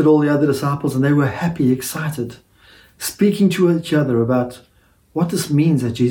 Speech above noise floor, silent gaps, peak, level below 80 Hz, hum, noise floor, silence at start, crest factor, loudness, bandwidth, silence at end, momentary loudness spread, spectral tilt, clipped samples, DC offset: 32 dB; none; -2 dBFS; -54 dBFS; none; -49 dBFS; 0 s; 14 dB; -18 LUFS; 18 kHz; 0 s; 12 LU; -6.5 dB/octave; under 0.1%; under 0.1%